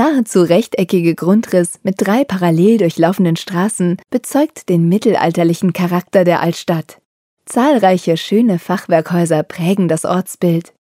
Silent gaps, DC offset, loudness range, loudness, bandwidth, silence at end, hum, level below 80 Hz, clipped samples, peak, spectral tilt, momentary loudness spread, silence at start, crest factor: 7.06-7.37 s; under 0.1%; 2 LU; -14 LUFS; 16 kHz; 0.35 s; none; -62 dBFS; under 0.1%; 0 dBFS; -6.5 dB/octave; 6 LU; 0 s; 14 dB